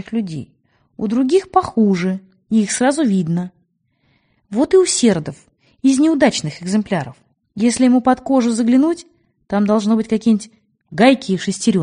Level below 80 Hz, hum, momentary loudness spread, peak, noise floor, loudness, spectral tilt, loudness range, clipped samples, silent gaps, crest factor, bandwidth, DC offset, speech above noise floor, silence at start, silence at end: -54 dBFS; none; 13 LU; 0 dBFS; -63 dBFS; -16 LUFS; -5 dB/octave; 2 LU; under 0.1%; none; 16 dB; 10 kHz; under 0.1%; 48 dB; 0.1 s; 0 s